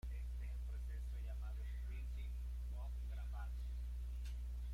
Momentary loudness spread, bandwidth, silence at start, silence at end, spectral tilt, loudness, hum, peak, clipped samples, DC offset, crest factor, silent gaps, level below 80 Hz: 0 LU; 11.5 kHz; 0.05 s; 0 s; -6 dB/octave; -48 LUFS; 60 Hz at -45 dBFS; -38 dBFS; under 0.1%; under 0.1%; 6 dB; none; -44 dBFS